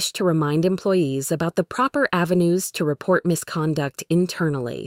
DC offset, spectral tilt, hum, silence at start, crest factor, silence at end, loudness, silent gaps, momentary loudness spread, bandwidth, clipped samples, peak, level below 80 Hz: under 0.1%; -5.5 dB/octave; none; 0 s; 16 dB; 0 s; -22 LUFS; none; 4 LU; 16.5 kHz; under 0.1%; -6 dBFS; -58 dBFS